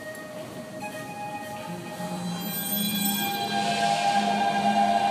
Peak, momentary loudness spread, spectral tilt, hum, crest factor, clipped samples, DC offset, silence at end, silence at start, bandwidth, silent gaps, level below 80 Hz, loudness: -12 dBFS; 14 LU; -3.5 dB/octave; none; 16 dB; under 0.1%; under 0.1%; 0 s; 0 s; 15.5 kHz; none; -68 dBFS; -26 LUFS